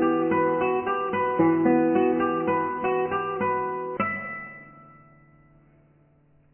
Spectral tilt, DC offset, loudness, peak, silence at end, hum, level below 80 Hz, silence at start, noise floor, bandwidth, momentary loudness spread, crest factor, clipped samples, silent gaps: -10.5 dB/octave; under 0.1%; -24 LUFS; -10 dBFS; 1.7 s; none; -62 dBFS; 0 s; -60 dBFS; 3.2 kHz; 10 LU; 16 dB; under 0.1%; none